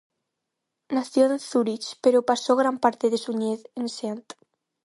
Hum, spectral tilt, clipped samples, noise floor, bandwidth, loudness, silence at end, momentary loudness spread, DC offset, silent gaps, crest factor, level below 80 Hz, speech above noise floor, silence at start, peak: none; -4.5 dB/octave; under 0.1%; -82 dBFS; 11.5 kHz; -24 LUFS; 0.65 s; 10 LU; under 0.1%; none; 20 dB; -76 dBFS; 59 dB; 0.9 s; -4 dBFS